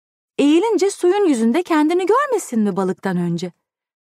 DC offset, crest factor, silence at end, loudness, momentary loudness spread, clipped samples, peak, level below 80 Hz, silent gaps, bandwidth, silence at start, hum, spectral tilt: under 0.1%; 12 dB; 0.65 s; -18 LUFS; 7 LU; under 0.1%; -6 dBFS; -72 dBFS; none; 15 kHz; 0.4 s; none; -5.5 dB/octave